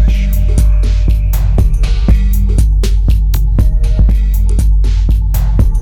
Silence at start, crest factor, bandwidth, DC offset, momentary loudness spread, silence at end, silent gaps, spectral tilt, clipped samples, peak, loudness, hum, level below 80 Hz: 0 s; 8 dB; 16.5 kHz; under 0.1%; 1 LU; 0 s; none; -7 dB/octave; under 0.1%; 0 dBFS; -13 LUFS; none; -10 dBFS